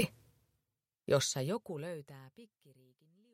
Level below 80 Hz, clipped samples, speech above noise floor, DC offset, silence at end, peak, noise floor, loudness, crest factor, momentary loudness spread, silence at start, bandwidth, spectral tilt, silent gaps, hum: -76 dBFS; under 0.1%; 50 dB; under 0.1%; 0.9 s; -16 dBFS; -88 dBFS; -36 LUFS; 22 dB; 23 LU; 0 s; 16.5 kHz; -4 dB/octave; none; none